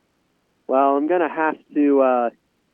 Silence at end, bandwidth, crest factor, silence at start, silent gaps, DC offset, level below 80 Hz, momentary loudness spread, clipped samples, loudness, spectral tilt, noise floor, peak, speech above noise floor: 0.45 s; 3.5 kHz; 14 dB; 0.7 s; none; under 0.1%; -78 dBFS; 6 LU; under 0.1%; -19 LUFS; -8.5 dB/octave; -67 dBFS; -6 dBFS; 48 dB